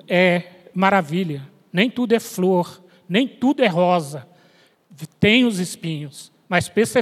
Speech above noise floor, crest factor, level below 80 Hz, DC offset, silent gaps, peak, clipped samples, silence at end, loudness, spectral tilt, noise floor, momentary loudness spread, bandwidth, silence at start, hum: 36 dB; 20 dB; -64 dBFS; under 0.1%; none; 0 dBFS; under 0.1%; 0 s; -19 LUFS; -5.5 dB/octave; -56 dBFS; 17 LU; 15 kHz; 0.1 s; none